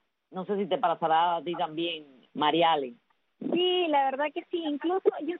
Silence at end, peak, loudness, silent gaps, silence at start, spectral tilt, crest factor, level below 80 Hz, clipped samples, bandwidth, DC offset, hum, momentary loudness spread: 0 s; -10 dBFS; -28 LUFS; none; 0.3 s; -2 dB/octave; 18 dB; -80 dBFS; under 0.1%; 4.2 kHz; under 0.1%; none; 14 LU